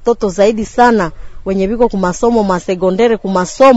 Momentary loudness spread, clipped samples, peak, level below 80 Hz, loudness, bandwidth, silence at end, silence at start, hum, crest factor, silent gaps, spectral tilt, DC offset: 6 LU; 0.3%; 0 dBFS; -34 dBFS; -13 LUFS; 8 kHz; 0 s; 0 s; none; 12 dB; none; -5.5 dB/octave; under 0.1%